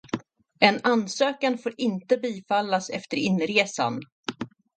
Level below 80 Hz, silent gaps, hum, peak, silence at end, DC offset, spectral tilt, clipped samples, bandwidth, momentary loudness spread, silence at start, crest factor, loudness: -70 dBFS; 4.12-4.23 s; none; 0 dBFS; 0.3 s; under 0.1%; -4.5 dB/octave; under 0.1%; 9.2 kHz; 14 LU; 0.15 s; 26 dB; -25 LUFS